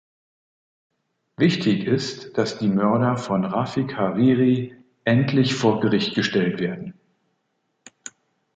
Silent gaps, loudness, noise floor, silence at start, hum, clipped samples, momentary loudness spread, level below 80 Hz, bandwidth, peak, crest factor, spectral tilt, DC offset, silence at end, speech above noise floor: none; -21 LUFS; -73 dBFS; 1.4 s; none; under 0.1%; 16 LU; -60 dBFS; 8.8 kHz; -6 dBFS; 18 dB; -6.5 dB/octave; under 0.1%; 0.45 s; 52 dB